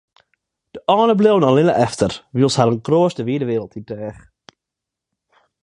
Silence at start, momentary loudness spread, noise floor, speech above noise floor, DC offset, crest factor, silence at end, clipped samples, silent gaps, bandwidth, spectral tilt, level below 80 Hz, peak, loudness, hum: 0.75 s; 16 LU; -84 dBFS; 67 dB; under 0.1%; 18 dB; 1.5 s; under 0.1%; none; 11 kHz; -6.5 dB/octave; -54 dBFS; 0 dBFS; -17 LUFS; none